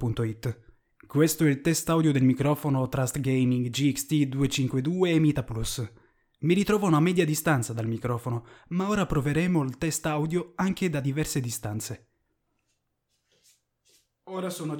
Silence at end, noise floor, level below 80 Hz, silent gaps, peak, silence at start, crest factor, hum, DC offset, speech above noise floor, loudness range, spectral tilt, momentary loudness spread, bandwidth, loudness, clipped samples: 0 s; -77 dBFS; -50 dBFS; none; -10 dBFS; 0 s; 16 dB; none; under 0.1%; 51 dB; 7 LU; -5.5 dB/octave; 11 LU; 19 kHz; -26 LUFS; under 0.1%